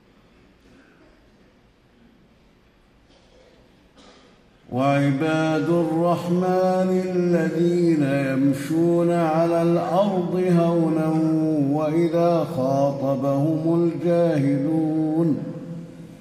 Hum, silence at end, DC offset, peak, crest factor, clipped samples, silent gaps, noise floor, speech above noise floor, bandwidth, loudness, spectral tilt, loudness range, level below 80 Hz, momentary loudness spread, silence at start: none; 0.05 s; under 0.1%; -8 dBFS; 14 dB; under 0.1%; none; -56 dBFS; 36 dB; 13.5 kHz; -21 LUFS; -8 dB/octave; 4 LU; -62 dBFS; 3 LU; 4.7 s